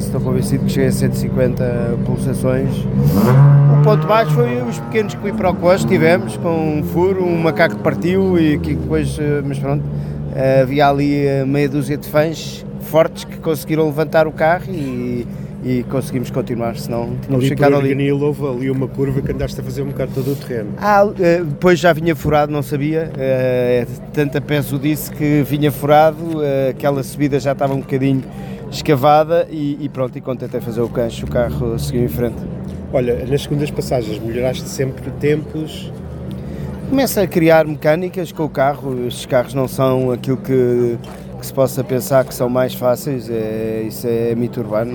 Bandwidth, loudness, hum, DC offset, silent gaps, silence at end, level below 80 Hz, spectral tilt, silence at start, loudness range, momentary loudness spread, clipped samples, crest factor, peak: 19 kHz; -17 LUFS; none; under 0.1%; none; 0 s; -38 dBFS; -7 dB/octave; 0 s; 6 LU; 10 LU; under 0.1%; 16 dB; 0 dBFS